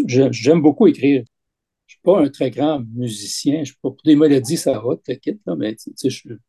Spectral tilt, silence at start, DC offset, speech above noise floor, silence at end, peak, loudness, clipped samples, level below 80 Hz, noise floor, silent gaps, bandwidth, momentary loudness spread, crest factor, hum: -6 dB/octave; 0 s; under 0.1%; 63 dB; 0.15 s; 0 dBFS; -18 LUFS; under 0.1%; -62 dBFS; -80 dBFS; none; 12.5 kHz; 12 LU; 16 dB; none